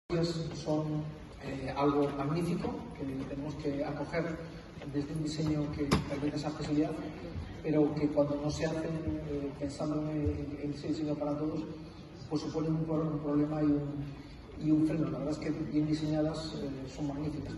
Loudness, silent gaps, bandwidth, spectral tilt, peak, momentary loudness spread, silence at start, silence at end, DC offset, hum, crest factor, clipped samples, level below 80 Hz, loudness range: -34 LUFS; none; 12 kHz; -7 dB/octave; -12 dBFS; 10 LU; 0.1 s; 0 s; under 0.1%; none; 22 dB; under 0.1%; -52 dBFS; 3 LU